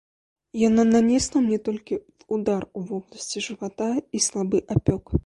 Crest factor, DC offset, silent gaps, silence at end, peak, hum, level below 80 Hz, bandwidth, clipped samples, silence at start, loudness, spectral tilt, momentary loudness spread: 18 dB; under 0.1%; none; 0.05 s; -6 dBFS; none; -42 dBFS; 11.5 kHz; under 0.1%; 0.55 s; -24 LUFS; -5 dB/octave; 14 LU